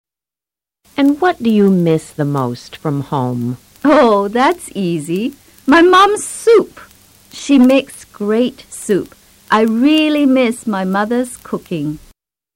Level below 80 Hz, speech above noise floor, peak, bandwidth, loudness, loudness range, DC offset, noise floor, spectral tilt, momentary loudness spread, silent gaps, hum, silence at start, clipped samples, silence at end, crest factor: -50 dBFS; 76 dB; -2 dBFS; 16.5 kHz; -14 LUFS; 3 LU; under 0.1%; -89 dBFS; -5.5 dB/octave; 14 LU; none; none; 0.95 s; under 0.1%; 0.6 s; 12 dB